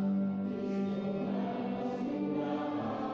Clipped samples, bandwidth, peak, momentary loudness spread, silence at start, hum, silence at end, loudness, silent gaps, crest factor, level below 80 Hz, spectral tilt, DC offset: under 0.1%; 6.6 kHz; -24 dBFS; 2 LU; 0 s; none; 0 s; -35 LUFS; none; 10 dB; -70 dBFS; -9 dB/octave; under 0.1%